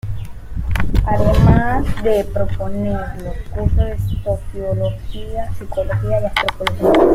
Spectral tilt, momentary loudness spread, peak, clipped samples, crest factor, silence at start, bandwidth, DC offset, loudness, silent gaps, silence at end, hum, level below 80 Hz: -7.5 dB/octave; 15 LU; 0 dBFS; under 0.1%; 16 dB; 0.05 s; 16 kHz; under 0.1%; -19 LUFS; none; 0 s; none; -24 dBFS